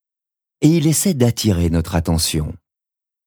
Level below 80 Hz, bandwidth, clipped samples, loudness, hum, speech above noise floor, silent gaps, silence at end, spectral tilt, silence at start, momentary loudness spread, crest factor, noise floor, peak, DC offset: -34 dBFS; over 20 kHz; under 0.1%; -17 LUFS; none; 71 dB; none; 0.7 s; -5 dB/octave; 0.6 s; 5 LU; 16 dB; -87 dBFS; -2 dBFS; under 0.1%